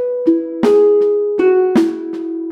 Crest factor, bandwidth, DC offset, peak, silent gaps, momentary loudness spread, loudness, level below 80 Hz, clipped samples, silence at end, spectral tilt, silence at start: 12 dB; 10 kHz; under 0.1%; -2 dBFS; none; 12 LU; -14 LUFS; -60 dBFS; under 0.1%; 0 s; -7 dB/octave; 0 s